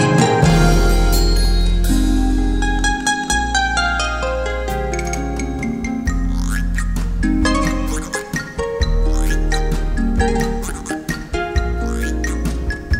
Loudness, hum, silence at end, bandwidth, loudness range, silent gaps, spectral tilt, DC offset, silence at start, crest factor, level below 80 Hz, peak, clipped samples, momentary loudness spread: -19 LUFS; none; 0 s; 16 kHz; 4 LU; none; -5 dB/octave; 0.2%; 0 s; 16 dB; -20 dBFS; 0 dBFS; under 0.1%; 8 LU